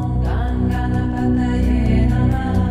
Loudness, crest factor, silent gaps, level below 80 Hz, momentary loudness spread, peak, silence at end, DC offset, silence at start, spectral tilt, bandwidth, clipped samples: -18 LUFS; 12 dB; none; -22 dBFS; 4 LU; -6 dBFS; 0 s; under 0.1%; 0 s; -9 dB/octave; 8.2 kHz; under 0.1%